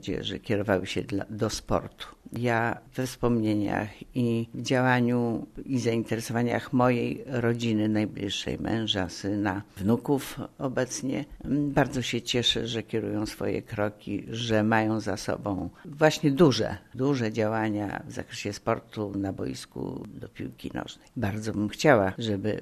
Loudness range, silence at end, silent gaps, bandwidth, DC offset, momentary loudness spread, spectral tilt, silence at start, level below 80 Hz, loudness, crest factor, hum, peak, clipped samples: 4 LU; 0 s; none; 13.5 kHz; under 0.1%; 12 LU; -5.5 dB/octave; 0 s; -52 dBFS; -28 LUFS; 22 dB; none; -6 dBFS; under 0.1%